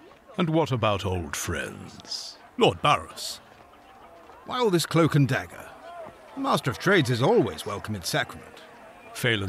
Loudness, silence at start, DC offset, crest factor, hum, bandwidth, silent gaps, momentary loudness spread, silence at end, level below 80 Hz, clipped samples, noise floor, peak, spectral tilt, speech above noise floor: -25 LUFS; 0.05 s; under 0.1%; 20 dB; none; 15 kHz; none; 20 LU; 0 s; -56 dBFS; under 0.1%; -51 dBFS; -6 dBFS; -5 dB/octave; 26 dB